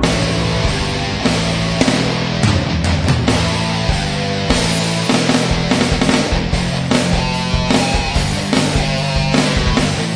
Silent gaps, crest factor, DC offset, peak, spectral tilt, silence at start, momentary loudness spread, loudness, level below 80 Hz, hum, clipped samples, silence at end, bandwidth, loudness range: none; 16 dB; under 0.1%; 0 dBFS; -4.5 dB/octave; 0 s; 3 LU; -16 LUFS; -26 dBFS; none; under 0.1%; 0 s; 11 kHz; 1 LU